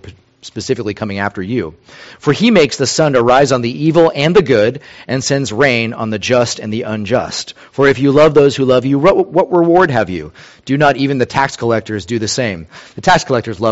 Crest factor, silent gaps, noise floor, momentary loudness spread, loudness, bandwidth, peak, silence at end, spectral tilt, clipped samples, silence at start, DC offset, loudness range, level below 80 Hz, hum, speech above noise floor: 14 dB; none; -36 dBFS; 11 LU; -13 LUFS; 8.2 kHz; 0 dBFS; 0 s; -5 dB/octave; under 0.1%; 0.05 s; under 0.1%; 4 LU; -44 dBFS; none; 23 dB